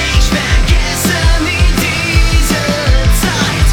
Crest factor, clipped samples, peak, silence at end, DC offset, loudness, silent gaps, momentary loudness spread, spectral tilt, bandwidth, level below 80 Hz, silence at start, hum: 10 dB; under 0.1%; 0 dBFS; 0 s; under 0.1%; -12 LUFS; none; 1 LU; -4 dB/octave; 18 kHz; -12 dBFS; 0 s; none